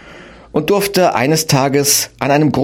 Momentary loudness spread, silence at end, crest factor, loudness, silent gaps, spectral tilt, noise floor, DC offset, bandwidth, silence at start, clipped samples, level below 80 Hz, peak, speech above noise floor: 4 LU; 0 s; 14 dB; -14 LUFS; none; -4 dB/octave; -38 dBFS; under 0.1%; 16.5 kHz; 0.05 s; under 0.1%; -46 dBFS; 0 dBFS; 24 dB